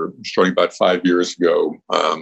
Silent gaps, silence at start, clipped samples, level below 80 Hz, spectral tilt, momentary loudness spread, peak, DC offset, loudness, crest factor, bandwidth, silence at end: none; 0 s; under 0.1%; -66 dBFS; -4.5 dB/octave; 4 LU; 0 dBFS; under 0.1%; -18 LUFS; 18 dB; 8.4 kHz; 0 s